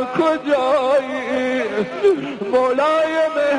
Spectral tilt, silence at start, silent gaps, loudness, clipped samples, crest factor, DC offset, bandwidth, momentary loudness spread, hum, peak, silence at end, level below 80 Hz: -5 dB/octave; 0 s; none; -18 LUFS; under 0.1%; 12 dB; under 0.1%; 10.5 kHz; 5 LU; none; -6 dBFS; 0 s; -58 dBFS